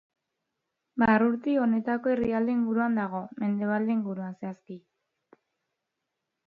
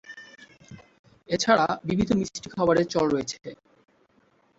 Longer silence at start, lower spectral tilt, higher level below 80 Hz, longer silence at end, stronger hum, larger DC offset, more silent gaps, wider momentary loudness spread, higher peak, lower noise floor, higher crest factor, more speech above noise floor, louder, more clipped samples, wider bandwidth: first, 0.95 s vs 0.1 s; first, -9.5 dB/octave vs -5 dB/octave; second, -62 dBFS vs -54 dBFS; first, 1.7 s vs 1.05 s; neither; neither; second, none vs 0.99-1.04 s; second, 15 LU vs 19 LU; second, -10 dBFS vs -6 dBFS; first, -84 dBFS vs -64 dBFS; about the same, 18 dB vs 22 dB; first, 57 dB vs 40 dB; about the same, -27 LUFS vs -25 LUFS; neither; second, 4.7 kHz vs 8 kHz